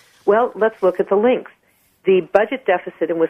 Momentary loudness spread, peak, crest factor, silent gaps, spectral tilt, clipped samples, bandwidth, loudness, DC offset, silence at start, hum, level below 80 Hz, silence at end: 6 LU; 0 dBFS; 18 dB; none; -7.5 dB/octave; under 0.1%; 6.2 kHz; -18 LUFS; under 0.1%; 0.25 s; none; -62 dBFS; 0 s